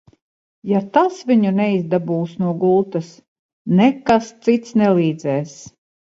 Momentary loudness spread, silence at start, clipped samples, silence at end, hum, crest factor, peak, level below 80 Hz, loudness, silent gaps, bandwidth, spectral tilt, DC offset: 10 LU; 0.65 s; under 0.1%; 0.45 s; none; 18 dB; 0 dBFS; -58 dBFS; -18 LUFS; 3.28-3.65 s; 7.8 kHz; -7.5 dB/octave; under 0.1%